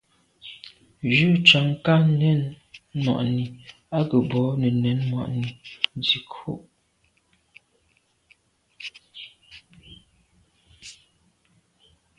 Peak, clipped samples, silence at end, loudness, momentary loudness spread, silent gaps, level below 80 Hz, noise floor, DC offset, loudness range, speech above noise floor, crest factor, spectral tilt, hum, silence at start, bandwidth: 0 dBFS; under 0.1%; 1.25 s; -22 LUFS; 25 LU; none; -60 dBFS; -67 dBFS; under 0.1%; 24 LU; 45 dB; 26 dB; -6.5 dB/octave; none; 0.45 s; 9.8 kHz